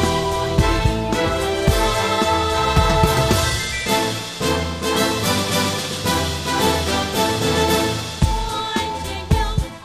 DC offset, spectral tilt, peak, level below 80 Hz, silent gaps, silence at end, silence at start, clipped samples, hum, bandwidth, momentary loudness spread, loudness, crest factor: under 0.1%; -4 dB/octave; -2 dBFS; -28 dBFS; none; 0 s; 0 s; under 0.1%; none; 15.5 kHz; 5 LU; -19 LUFS; 16 dB